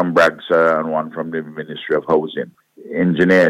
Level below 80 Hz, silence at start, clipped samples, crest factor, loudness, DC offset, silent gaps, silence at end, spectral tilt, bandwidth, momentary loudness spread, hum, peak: -58 dBFS; 0 s; under 0.1%; 16 dB; -18 LUFS; under 0.1%; none; 0 s; -7 dB/octave; 15 kHz; 14 LU; none; -2 dBFS